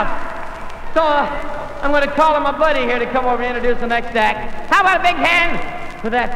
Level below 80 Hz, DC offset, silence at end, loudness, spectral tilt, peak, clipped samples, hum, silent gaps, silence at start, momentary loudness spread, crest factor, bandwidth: -30 dBFS; under 0.1%; 0 s; -17 LUFS; -4.5 dB/octave; -4 dBFS; under 0.1%; none; none; 0 s; 13 LU; 12 dB; 11 kHz